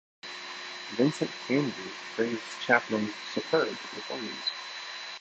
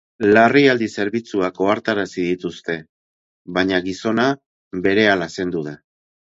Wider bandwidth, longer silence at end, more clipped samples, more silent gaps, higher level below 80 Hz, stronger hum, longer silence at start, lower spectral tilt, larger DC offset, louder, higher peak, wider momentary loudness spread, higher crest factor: first, 9 kHz vs 7.8 kHz; second, 0 s vs 0.55 s; neither; second, none vs 2.89-3.45 s, 4.46-4.71 s; second, -76 dBFS vs -54 dBFS; neither; about the same, 0.25 s vs 0.2 s; about the same, -4.5 dB/octave vs -5.5 dB/octave; neither; second, -31 LUFS vs -19 LUFS; second, -8 dBFS vs 0 dBFS; about the same, 12 LU vs 14 LU; about the same, 22 dB vs 18 dB